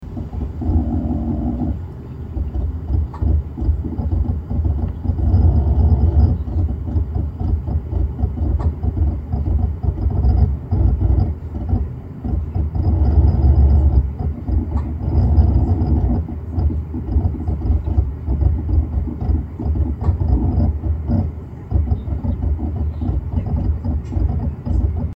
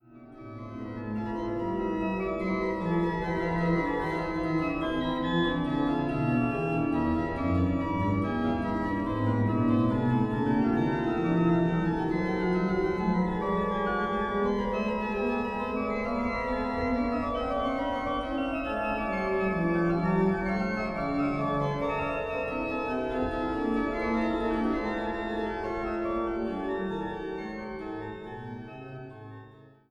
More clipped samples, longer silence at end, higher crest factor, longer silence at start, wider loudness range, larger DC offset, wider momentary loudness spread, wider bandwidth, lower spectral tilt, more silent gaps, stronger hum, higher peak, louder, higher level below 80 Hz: neither; second, 0.05 s vs 0.2 s; about the same, 16 dB vs 16 dB; about the same, 0 s vs 0.1 s; about the same, 5 LU vs 5 LU; neither; about the same, 8 LU vs 9 LU; second, 2.3 kHz vs 8.6 kHz; first, -11.5 dB/octave vs -8.5 dB/octave; neither; neither; first, -2 dBFS vs -14 dBFS; first, -20 LUFS vs -29 LUFS; first, -20 dBFS vs -46 dBFS